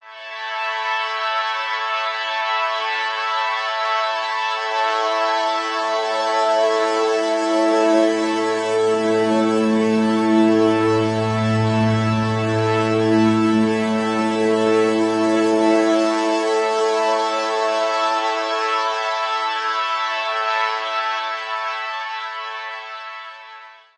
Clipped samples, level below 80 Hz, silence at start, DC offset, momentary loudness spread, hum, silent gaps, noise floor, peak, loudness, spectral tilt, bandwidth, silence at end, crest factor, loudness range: under 0.1%; -62 dBFS; 0.05 s; under 0.1%; 8 LU; none; none; -41 dBFS; -6 dBFS; -19 LUFS; -5 dB/octave; 11 kHz; 0.25 s; 14 dB; 4 LU